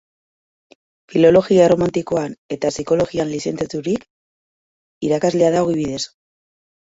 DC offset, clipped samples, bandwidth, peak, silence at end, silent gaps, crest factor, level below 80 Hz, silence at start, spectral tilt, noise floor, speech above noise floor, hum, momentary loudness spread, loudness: under 0.1%; under 0.1%; 8 kHz; -2 dBFS; 0.85 s; 2.38-2.49 s, 4.10-5.01 s; 18 dB; -52 dBFS; 1.1 s; -6 dB/octave; under -90 dBFS; over 73 dB; none; 12 LU; -18 LUFS